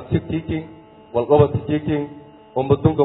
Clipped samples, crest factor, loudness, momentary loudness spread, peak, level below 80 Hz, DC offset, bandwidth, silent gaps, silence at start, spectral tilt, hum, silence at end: under 0.1%; 18 dB; -20 LUFS; 13 LU; -2 dBFS; -44 dBFS; under 0.1%; 4.1 kHz; none; 0 s; -12.5 dB/octave; none; 0 s